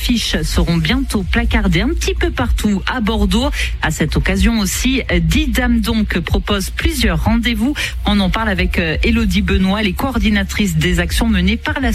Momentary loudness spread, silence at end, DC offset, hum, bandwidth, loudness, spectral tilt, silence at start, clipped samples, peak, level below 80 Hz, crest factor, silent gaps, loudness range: 3 LU; 0 s; under 0.1%; none; 15 kHz; -16 LUFS; -5 dB/octave; 0 s; under 0.1%; -2 dBFS; -20 dBFS; 14 dB; none; 1 LU